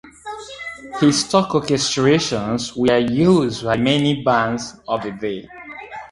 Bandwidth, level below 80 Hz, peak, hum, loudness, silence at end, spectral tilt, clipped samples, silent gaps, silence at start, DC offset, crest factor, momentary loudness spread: 11.5 kHz; -50 dBFS; 0 dBFS; none; -18 LUFS; 0.05 s; -5 dB/octave; under 0.1%; none; 0.05 s; under 0.1%; 18 dB; 17 LU